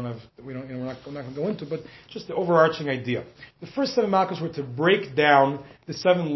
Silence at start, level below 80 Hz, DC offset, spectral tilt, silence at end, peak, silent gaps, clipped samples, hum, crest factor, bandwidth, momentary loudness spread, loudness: 0 s; -62 dBFS; under 0.1%; -6.5 dB/octave; 0 s; -4 dBFS; none; under 0.1%; none; 22 dB; 6.2 kHz; 18 LU; -24 LUFS